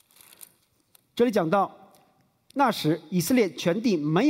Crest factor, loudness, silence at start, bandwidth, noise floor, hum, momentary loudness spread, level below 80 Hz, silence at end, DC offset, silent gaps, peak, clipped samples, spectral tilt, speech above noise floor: 16 dB; -25 LUFS; 1.15 s; 16 kHz; -64 dBFS; none; 6 LU; -68 dBFS; 0 s; under 0.1%; none; -10 dBFS; under 0.1%; -5.5 dB/octave; 41 dB